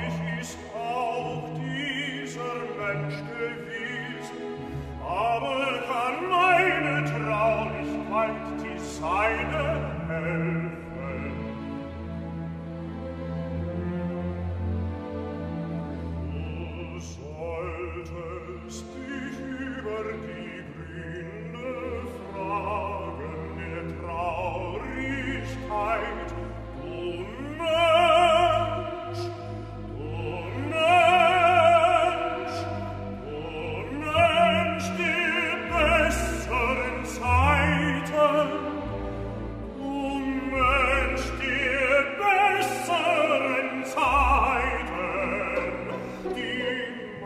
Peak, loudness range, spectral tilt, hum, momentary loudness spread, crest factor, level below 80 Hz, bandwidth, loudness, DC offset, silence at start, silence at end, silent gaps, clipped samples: -8 dBFS; 12 LU; -5.5 dB/octave; none; 15 LU; 18 dB; -42 dBFS; 15 kHz; -26 LUFS; under 0.1%; 0 s; 0 s; none; under 0.1%